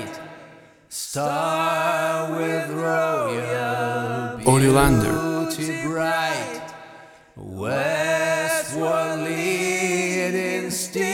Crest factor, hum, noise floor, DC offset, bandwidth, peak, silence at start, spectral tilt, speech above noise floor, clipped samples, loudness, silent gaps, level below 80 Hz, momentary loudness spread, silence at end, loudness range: 20 dB; none; -47 dBFS; under 0.1%; 17 kHz; -2 dBFS; 0 s; -4.5 dB/octave; 28 dB; under 0.1%; -22 LUFS; none; -42 dBFS; 13 LU; 0 s; 4 LU